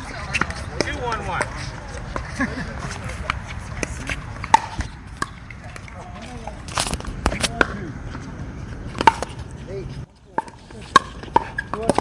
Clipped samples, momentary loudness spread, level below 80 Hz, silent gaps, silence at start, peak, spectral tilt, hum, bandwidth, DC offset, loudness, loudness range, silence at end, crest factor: under 0.1%; 17 LU; -36 dBFS; none; 0 s; 0 dBFS; -4 dB/octave; none; 11.5 kHz; under 0.1%; -25 LUFS; 4 LU; 0 s; 26 dB